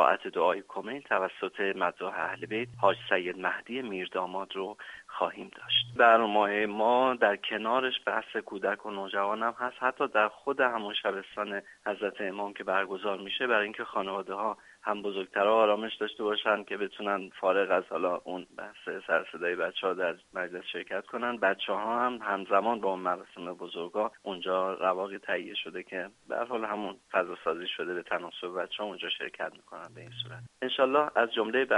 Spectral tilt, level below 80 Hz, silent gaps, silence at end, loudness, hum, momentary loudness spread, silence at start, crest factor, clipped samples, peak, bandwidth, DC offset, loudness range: -5 dB/octave; -76 dBFS; none; 0 s; -30 LUFS; none; 12 LU; 0 s; 22 dB; under 0.1%; -8 dBFS; 11.5 kHz; under 0.1%; 7 LU